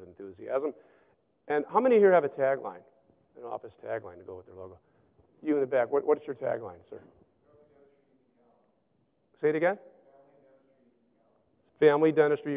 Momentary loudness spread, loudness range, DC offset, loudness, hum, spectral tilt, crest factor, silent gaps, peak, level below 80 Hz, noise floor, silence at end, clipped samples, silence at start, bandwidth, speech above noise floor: 24 LU; 9 LU; under 0.1%; -27 LUFS; none; -10 dB/octave; 22 dB; none; -10 dBFS; -74 dBFS; -72 dBFS; 0 s; under 0.1%; 0 s; 3.9 kHz; 45 dB